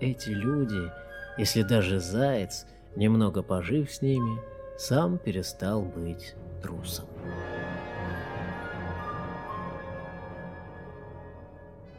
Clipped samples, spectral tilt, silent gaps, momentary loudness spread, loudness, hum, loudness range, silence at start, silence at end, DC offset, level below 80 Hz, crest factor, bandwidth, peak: under 0.1%; -6 dB/octave; none; 17 LU; -30 LUFS; none; 10 LU; 0 s; 0 s; under 0.1%; -50 dBFS; 20 dB; 16 kHz; -12 dBFS